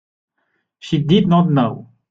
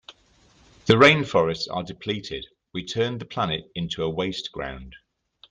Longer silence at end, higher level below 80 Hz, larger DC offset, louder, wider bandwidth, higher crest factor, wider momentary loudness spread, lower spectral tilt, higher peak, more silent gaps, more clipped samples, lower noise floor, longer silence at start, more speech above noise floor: second, 0.3 s vs 0.55 s; about the same, -52 dBFS vs -52 dBFS; neither; first, -16 LUFS vs -23 LUFS; second, 7.4 kHz vs 9.4 kHz; second, 16 dB vs 22 dB; about the same, 19 LU vs 19 LU; first, -8.5 dB/octave vs -5.5 dB/octave; about the same, -2 dBFS vs -2 dBFS; neither; neither; first, -70 dBFS vs -59 dBFS; first, 0.85 s vs 0.1 s; first, 55 dB vs 35 dB